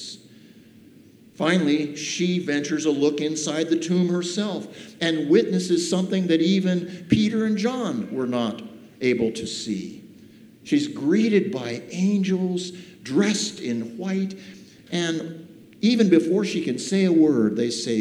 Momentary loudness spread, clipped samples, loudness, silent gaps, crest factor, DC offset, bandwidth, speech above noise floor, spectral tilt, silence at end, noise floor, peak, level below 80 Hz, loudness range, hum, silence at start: 11 LU; under 0.1%; -23 LUFS; none; 20 dB; under 0.1%; 11.5 kHz; 28 dB; -5.5 dB/octave; 0 s; -50 dBFS; -4 dBFS; -62 dBFS; 4 LU; none; 0 s